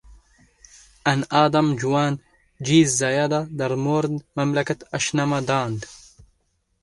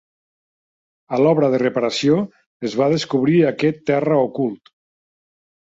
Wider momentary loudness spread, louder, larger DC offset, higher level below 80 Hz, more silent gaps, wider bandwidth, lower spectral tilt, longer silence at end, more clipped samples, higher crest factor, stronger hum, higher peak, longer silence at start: about the same, 9 LU vs 10 LU; second, -22 LUFS vs -18 LUFS; neither; first, -56 dBFS vs -62 dBFS; second, none vs 2.46-2.60 s; first, 11.5 kHz vs 7.8 kHz; second, -5 dB/octave vs -6.5 dB/octave; second, 0.85 s vs 1.1 s; neither; about the same, 20 dB vs 16 dB; neither; about the same, -2 dBFS vs -4 dBFS; second, 0.1 s vs 1.1 s